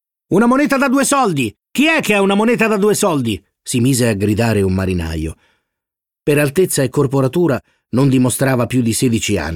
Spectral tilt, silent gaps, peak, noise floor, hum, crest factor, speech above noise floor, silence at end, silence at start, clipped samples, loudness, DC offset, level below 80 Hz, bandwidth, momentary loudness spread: -5 dB/octave; none; -2 dBFS; -84 dBFS; none; 14 dB; 70 dB; 0 s; 0.3 s; under 0.1%; -15 LUFS; under 0.1%; -40 dBFS; 17.5 kHz; 8 LU